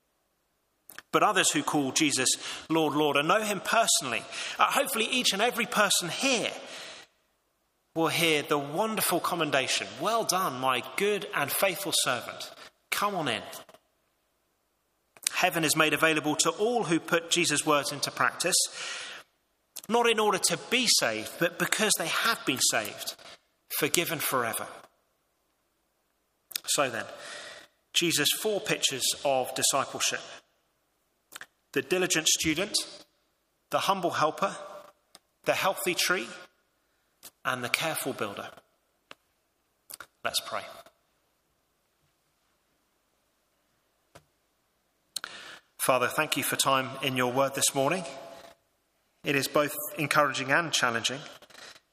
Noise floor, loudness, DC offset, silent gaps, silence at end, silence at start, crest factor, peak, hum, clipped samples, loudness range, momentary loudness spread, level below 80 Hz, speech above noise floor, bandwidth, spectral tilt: -75 dBFS; -27 LUFS; under 0.1%; none; 0.2 s; 1.15 s; 30 dB; 0 dBFS; none; under 0.1%; 9 LU; 17 LU; -72 dBFS; 47 dB; 15.5 kHz; -2 dB/octave